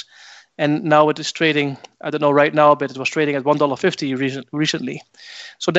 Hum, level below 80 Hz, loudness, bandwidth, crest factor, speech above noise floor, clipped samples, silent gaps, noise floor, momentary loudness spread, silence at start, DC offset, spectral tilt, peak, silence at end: none; -68 dBFS; -18 LUFS; 8.2 kHz; 18 dB; 27 dB; under 0.1%; none; -45 dBFS; 15 LU; 0.6 s; under 0.1%; -5 dB/octave; 0 dBFS; 0 s